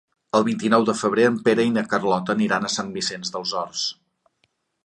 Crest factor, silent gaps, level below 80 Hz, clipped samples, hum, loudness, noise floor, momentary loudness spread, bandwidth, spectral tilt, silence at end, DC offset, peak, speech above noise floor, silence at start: 18 dB; none; -64 dBFS; under 0.1%; none; -22 LUFS; -70 dBFS; 7 LU; 11 kHz; -4 dB/octave; 0.95 s; under 0.1%; -4 dBFS; 48 dB; 0.35 s